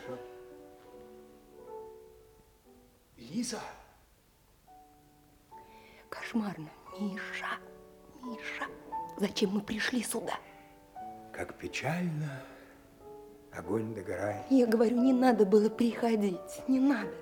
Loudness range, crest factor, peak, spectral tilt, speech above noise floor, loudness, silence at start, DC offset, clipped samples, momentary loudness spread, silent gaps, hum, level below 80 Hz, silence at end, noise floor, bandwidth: 16 LU; 22 dB; -12 dBFS; -5.5 dB/octave; 34 dB; -32 LUFS; 0 s; under 0.1%; under 0.1%; 26 LU; none; none; -68 dBFS; 0 s; -65 dBFS; 18 kHz